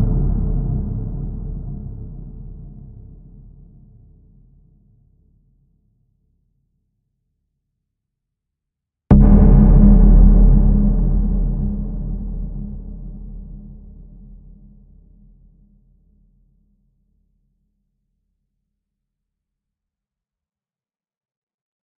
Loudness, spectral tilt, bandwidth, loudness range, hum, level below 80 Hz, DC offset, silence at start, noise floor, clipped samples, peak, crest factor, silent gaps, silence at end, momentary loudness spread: -16 LUFS; -13.5 dB/octave; 1.8 kHz; 23 LU; none; -20 dBFS; under 0.1%; 0 s; under -90 dBFS; under 0.1%; 0 dBFS; 18 dB; none; 8.25 s; 26 LU